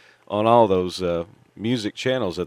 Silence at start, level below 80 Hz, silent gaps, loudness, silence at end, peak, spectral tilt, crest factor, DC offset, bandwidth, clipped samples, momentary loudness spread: 0.3 s; -56 dBFS; none; -22 LUFS; 0 s; -2 dBFS; -6 dB/octave; 20 dB; under 0.1%; 14.5 kHz; under 0.1%; 12 LU